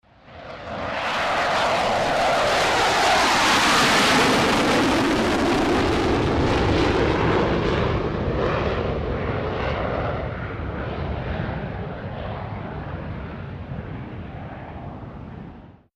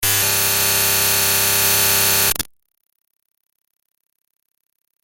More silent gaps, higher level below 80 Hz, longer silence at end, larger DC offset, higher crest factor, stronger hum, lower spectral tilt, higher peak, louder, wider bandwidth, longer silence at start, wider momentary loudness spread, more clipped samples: neither; first, -36 dBFS vs -46 dBFS; second, 0.25 s vs 2.6 s; neither; about the same, 16 dB vs 18 dB; neither; first, -4.5 dB/octave vs -0.5 dB/octave; second, -8 dBFS vs -2 dBFS; second, -21 LUFS vs -14 LUFS; about the same, 15.5 kHz vs 17 kHz; first, 0.25 s vs 0 s; first, 19 LU vs 4 LU; neither